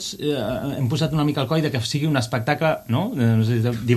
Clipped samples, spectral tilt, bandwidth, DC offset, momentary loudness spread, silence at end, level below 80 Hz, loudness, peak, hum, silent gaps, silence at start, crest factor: under 0.1%; -6 dB/octave; 13.5 kHz; under 0.1%; 5 LU; 0 s; -50 dBFS; -22 LUFS; -4 dBFS; none; none; 0 s; 16 dB